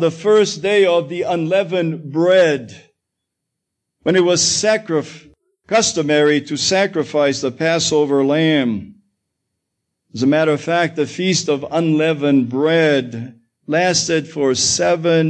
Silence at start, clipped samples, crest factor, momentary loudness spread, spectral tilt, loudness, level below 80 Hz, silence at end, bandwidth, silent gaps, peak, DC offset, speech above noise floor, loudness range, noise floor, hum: 0 s; under 0.1%; 14 dB; 7 LU; -4 dB/octave; -16 LUFS; -58 dBFS; 0 s; 9.8 kHz; none; -4 dBFS; under 0.1%; 62 dB; 3 LU; -78 dBFS; none